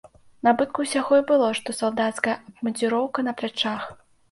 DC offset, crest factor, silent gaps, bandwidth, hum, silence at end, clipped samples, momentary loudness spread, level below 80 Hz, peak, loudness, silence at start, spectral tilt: under 0.1%; 18 dB; none; 11.5 kHz; none; 0.35 s; under 0.1%; 8 LU; -66 dBFS; -6 dBFS; -24 LUFS; 0.45 s; -3.5 dB/octave